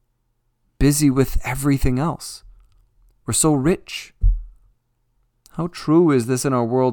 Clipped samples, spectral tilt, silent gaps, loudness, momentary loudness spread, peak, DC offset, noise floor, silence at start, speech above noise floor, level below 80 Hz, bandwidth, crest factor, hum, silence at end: under 0.1%; -5.5 dB/octave; none; -19 LUFS; 15 LU; -2 dBFS; under 0.1%; -68 dBFS; 0.8 s; 50 dB; -30 dBFS; 19 kHz; 18 dB; none; 0 s